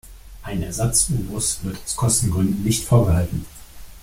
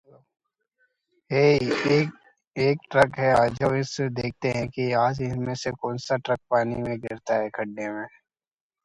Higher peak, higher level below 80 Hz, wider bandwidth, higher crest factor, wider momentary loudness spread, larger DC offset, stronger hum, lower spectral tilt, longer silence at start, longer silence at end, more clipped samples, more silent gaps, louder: about the same, -4 dBFS vs -6 dBFS; first, -36 dBFS vs -56 dBFS; first, 16.5 kHz vs 11.5 kHz; about the same, 16 dB vs 20 dB; about the same, 12 LU vs 11 LU; neither; neither; about the same, -5 dB/octave vs -6 dB/octave; second, 0.05 s vs 1.3 s; second, 0 s vs 0.75 s; neither; second, none vs 2.47-2.51 s; first, -20 LUFS vs -25 LUFS